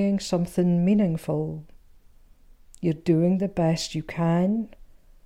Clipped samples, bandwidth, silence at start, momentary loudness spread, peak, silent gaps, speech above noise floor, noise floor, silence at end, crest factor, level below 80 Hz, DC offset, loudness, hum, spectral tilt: under 0.1%; 12.5 kHz; 0 s; 9 LU; -10 dBFS; none; 29 dB; -52 dBFS; 0.4 s; 14 dB; -50 dBFS; under 0.1%; -24 LUFS; none; -7 dB/octave